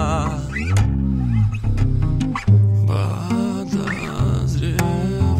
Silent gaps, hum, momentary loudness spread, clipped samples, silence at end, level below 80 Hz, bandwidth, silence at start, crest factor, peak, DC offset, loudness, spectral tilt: none; none; 7 LU; under 0.1%; 0 s; -28 dBFS; 15 kHz; 0 s; 14 dB; -4 dBFS; under 0.1%; -20 LUFS; -7 dB/octave